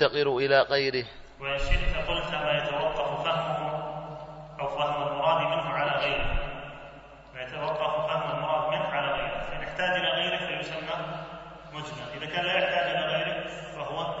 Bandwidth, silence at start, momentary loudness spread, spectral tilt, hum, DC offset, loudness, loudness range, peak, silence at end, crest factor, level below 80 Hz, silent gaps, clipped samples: 8 kHz; 0 s; 14 LU; -5 dB/octave; none; under 0.1%; -28 LUFS; 2 LU; -8 dBFS; 0 s; 20 dB; -40 dBFS; none; under 0.1%